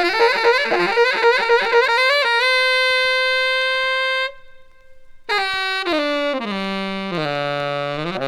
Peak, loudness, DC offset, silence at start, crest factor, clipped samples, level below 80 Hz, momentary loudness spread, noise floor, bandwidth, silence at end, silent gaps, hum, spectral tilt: -4 dBFS; -17 LUFS; under 0.1%; 0 s; 16 dB; under 0.1%; -54 dBFS; 9 LU; -42 dBFS; 17 kHz; 0 s; none; none; -3.5 dB/octave